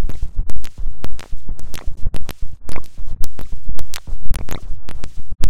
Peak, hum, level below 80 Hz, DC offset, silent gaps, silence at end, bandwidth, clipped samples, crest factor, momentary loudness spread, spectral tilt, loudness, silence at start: 0 dBFS; none; -24 dBFS; under 0.1%; none; 0 s; 12 kHz; 2%; 8 dB; 7 LU; -5 dB/octave; -32 LUFS; 0 s